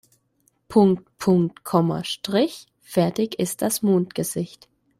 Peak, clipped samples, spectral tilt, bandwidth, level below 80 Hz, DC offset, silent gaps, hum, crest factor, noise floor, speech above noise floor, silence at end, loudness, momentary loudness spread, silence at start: -4 dBFS; under 0.1%; -6 dB/octave; 15.5 kHz; -62 dBFS; under 0.1%; none; none; 18 dB; -67 dBFS; 45 dB; 0.55 s; -22 LUFS; 9 LU; 0.7 s